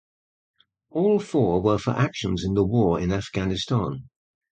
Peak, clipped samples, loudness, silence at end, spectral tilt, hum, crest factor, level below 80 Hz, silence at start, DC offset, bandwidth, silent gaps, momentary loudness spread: -8 dBFS; under 0.1%; -24 LUFS; 0.55 s; -7 dB/octave; none; 16 dB; -44 dBFS; 0.95 s; under 0.1%; 9.2 kHz; none; 6 LU